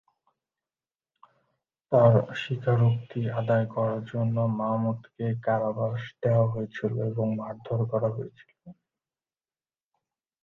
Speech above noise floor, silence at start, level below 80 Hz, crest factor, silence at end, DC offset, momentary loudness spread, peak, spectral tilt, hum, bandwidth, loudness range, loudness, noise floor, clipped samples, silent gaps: over 64 dB; 1.9 s; -64 dBFS; 20 dB; 1.7 s; under 0.1%; 10 LU; -6 dBFS; -9.5 dB/octave; none; 6.6 kHz; 7 LU; -27 LUFS; under -90 dBFS; under 0.1%; none